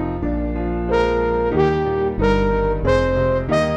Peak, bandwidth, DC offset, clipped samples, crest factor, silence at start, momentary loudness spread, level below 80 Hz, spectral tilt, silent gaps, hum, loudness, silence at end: -4 dBFS; 9.4 kHz; under 0.1%; under 0.1%; 16 dB; 0 s; 6 LU; -28 dBFS; -7.5 dB/octave; none; none; -19 LUFS; 0 s